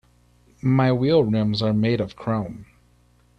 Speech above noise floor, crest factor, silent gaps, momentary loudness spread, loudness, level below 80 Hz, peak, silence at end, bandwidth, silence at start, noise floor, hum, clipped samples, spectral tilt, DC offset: 38 dB; 16 dB; none; 9 LU; -21 LUFS; -52 dBFS; -6 dBFS; 0.75 s; 6.4 kHz; 0.65 s; -58 dBFS; 60 Hz at -45 dBFS; under 0.1%; -8.5 dB/octave; under 0.1%